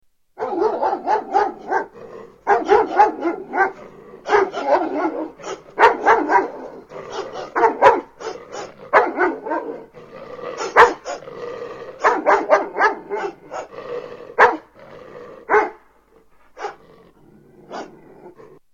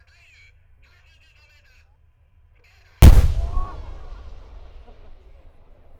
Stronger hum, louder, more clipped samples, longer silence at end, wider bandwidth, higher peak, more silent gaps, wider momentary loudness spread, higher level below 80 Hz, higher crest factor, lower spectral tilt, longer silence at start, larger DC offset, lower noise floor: neither; about the same, -18 LUFS vs -16 LUFS; neither; second, 0.45 s vs 2.1 s; second, 9 kHz vs 18.5 kHz; about the same, 0 dBFS vs 0 dBFS; neither; second, 21 LU vs 30 LU; second, -56 dBFS vs -22 dBFS; about the same, 20 dB vs 20 dB; second, -4 dB/octave vs -6.5 dB/octave; second, 0.4 s vs 3 s; neither; about the same, -53 dBFS vs -56 dBFS